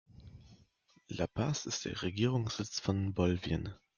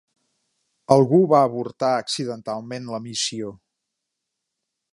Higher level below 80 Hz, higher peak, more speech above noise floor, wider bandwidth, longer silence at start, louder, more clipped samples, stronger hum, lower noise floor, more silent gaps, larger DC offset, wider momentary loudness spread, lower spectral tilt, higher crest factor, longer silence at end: first, -58 dBFS vs -68 dBFS; second, -18 dBFS vs -2 dBFS; second, 34 dB vs 61 dB; second, 7.4 kHz vs 11.5 kHz; second, 0.2 s vs 0.9 s; second, -35 LUFS vs -21 LUFS; neither; neither; second, -68 dBFS vs -81 dBFS; neither; neither; second, 7 LU vs 15 LU; about the same, -5.5 dB/octave vs -5.5 dB/octave; about the same, 18 dB vs 22 dB; second, 0.2 s vs 1.35 s